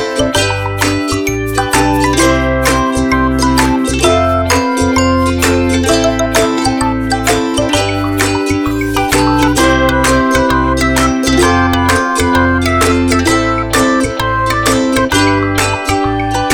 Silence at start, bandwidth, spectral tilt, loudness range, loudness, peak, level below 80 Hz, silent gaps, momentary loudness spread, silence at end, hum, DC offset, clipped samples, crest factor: 0 s; over 20 kHz; -4.5 dB/octave; 2 LU; -12 LUFS; 0 dBFS; -24 dBFS; none; 4 LU; 0 s; none; 0.4%; under 0.1%; 12 dB